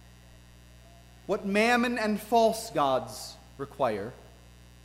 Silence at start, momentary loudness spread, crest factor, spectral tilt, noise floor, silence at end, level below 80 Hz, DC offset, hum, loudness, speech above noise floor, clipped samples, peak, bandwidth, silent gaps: 1.3 s; 18 LU; 18 dB; -4.5 dB/octave; -53 dBFS; 0.6 s; -56 dBFS; under 0.1%; 60 Hz at -50 dBFS; -27 LUFS; 25 dB; under 0.1%; -12 dBFS; 16 kHz; none